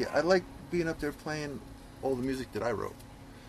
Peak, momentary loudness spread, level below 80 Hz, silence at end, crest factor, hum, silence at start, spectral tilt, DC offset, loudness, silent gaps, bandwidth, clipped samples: -14 dBFS; 17 LU; -52 dBFS; 0 s; 20 dB; none; 0 s; -5.5 dB/octave; under 0.1%; -33 LUFS; none; 14 kHz; under 0.1%